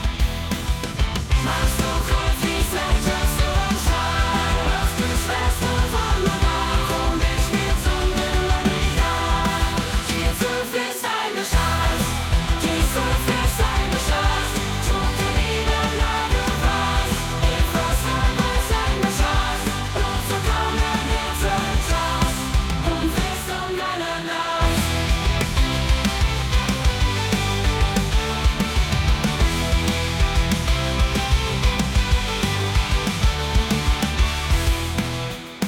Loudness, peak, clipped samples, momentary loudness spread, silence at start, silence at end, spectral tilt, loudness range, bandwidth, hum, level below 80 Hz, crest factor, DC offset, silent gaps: -21 LUFS; -6 dBFS; under 0.1%; 3 LU; 0 s; 0 s; -4.5 dB/octave; 1 LU; 18.5 kHz; none; -24 dBFS; 14 dB; under 0.1%; none